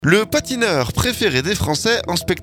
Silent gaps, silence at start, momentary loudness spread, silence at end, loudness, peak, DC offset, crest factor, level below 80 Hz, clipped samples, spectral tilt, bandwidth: none; 0 s; 3 LU; 0 s; -18 LUFS; 0 dBFS; under 0.1%; 18 dB; -38 dBFS; under 0.1%; -4 dB/octave; over 20 kHz